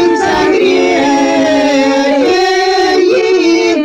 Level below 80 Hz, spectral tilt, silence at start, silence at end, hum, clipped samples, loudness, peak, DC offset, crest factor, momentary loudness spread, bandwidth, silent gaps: -44 dBFS; -3.5 dB/octave; 0 s; 0 s; none; under 0.1%; -10 LUFS; 0 dBFS; under 0.1%; 8 dB; 1 LU; 10.5 kHz; none